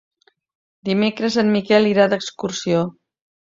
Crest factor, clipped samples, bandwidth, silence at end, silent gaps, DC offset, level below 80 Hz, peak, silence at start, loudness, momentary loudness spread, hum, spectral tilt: 18 dB; under 0.1%; 7.6 kHz; 0.6 s; none; under 0.1%; -62 dBFS; -2 dBFS; 0.85 s; -19 LUFS; 10 LU; none; -5.5 dB/octave